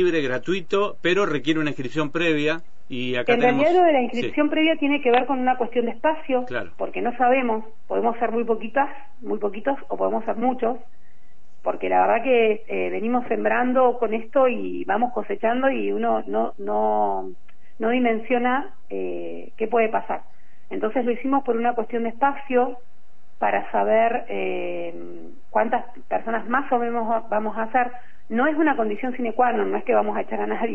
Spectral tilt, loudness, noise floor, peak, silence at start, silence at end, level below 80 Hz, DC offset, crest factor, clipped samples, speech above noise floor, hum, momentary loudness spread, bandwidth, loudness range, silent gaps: -6.5 dB/octave; -23 LUFS; -58 dBFS; -6 dBFS; 0 s; 0 s; -62 dBFS; 4%; 18 dB; under 0.1%; 35 dB; none; 10 LU; 8 kHz; 4 LU; none